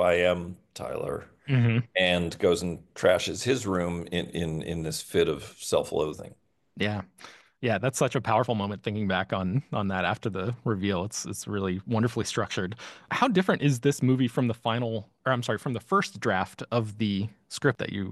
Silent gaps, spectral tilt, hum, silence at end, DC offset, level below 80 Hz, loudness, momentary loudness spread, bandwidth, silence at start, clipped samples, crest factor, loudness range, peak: none; -5.5 dB/octave; none; 0 s; under 0.1%; -56 dBFS; -28 LUFS; 9 LU; 12.5 kHz; 0 s; under 0.1%; 20 dB; 4 LU; -8 dBFS